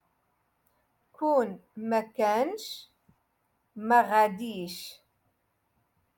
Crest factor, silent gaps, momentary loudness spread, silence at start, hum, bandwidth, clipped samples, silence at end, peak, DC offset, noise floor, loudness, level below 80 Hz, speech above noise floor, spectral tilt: 22 dB; none; 17 LU; 1.2 s; none; 17.5 kHz; under 0.1%; 1.25 s; -10 dBFS; under 0.1%; -75 dBFS; -28 LUFS; -78 dBFS; 47 dB; -4.5 dB/octave